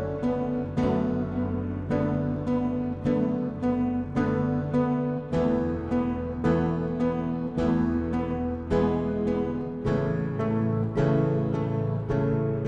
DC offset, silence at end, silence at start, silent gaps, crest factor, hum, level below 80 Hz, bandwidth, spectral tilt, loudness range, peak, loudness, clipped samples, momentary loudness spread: under 0.1%; 0 s; 0 s; none; 14 dB; none; -44 dBFS; 7.8 kHz; -9.5 dB/octave; 1 LU; -12 dBFS; -27 LUFS; under 0.1%; 4 LU